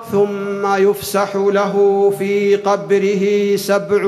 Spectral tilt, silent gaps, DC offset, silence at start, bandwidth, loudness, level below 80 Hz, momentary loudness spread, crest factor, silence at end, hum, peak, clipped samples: -5.5 dB/octave; none; under 0.1%; 0 s; 14 kHz; -16 LUFS; -62 dBFS; 4 LU; 12 dB; 0 s; none; -2 dBFS; under 0.1%